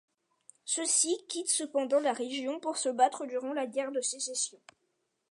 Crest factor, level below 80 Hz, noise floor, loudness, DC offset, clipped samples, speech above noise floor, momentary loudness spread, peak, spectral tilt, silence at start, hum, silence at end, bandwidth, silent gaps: 20 dB; under -90 dBFS; -79 dBFS; -31 LUFS; under 0.1%; under 0.1%; 48 dB; 8 LU; -12 dBFS; 0 dB/octave; 0.65 s; none; 0.75 s; 11.5 kHz; none